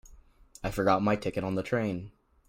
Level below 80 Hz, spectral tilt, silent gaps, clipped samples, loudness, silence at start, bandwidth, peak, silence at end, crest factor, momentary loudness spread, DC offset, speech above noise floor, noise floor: -52 dBFS; -6.5 dB/octave; none; under 0.1%; -30 LUFS; 0.05 s; 16 kHz; -12 dBFS; 0.4 s; 20 dB; 13 LU; under 0.1%; 26 dB; -55 dBFS